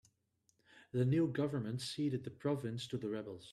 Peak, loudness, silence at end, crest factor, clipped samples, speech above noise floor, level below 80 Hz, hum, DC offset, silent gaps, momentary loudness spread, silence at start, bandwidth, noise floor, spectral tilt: -24 dBFS; -38 LUFS; 0 s; 14 dB; under 0.1%; 41 dB; -74 dBFS; none; under 0.1%; none; 9 LU; 0.75 s; 12.5 kHz; -79 dBFS; -7 dB/octave